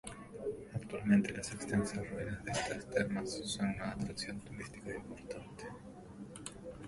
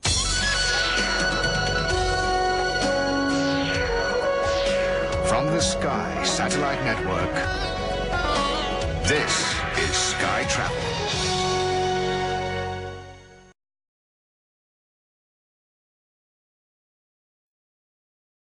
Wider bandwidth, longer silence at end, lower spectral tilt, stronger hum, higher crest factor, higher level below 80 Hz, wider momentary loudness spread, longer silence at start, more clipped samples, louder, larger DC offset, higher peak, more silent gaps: about the same, 11.5 kHz vs 11.5 kHz; second, 0 s vs 5.1 s; first, -5 dB/octave vs -3 dB/octave; neither; about the same, 22 dB vs 18 dB; second, -60 dBFS vs -38 dBFS; first, 16 LU vs 5 LU; about the same, 0.05 s vs 0.05 s; neither; second, -39 LUFS vs -23 LUFS; neither; second, -18 dBFS vs -8 dBFS; neither